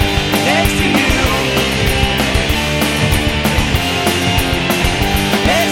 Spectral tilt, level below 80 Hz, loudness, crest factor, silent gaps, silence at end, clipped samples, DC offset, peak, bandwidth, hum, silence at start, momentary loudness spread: -4 dB/octave; -22 dBFS; -14 LUFS; 14 dB; none; 0 s; under 0.1%; under 0.1%; 0 dBFS; 19 kHz; none; 0 s; 2 LU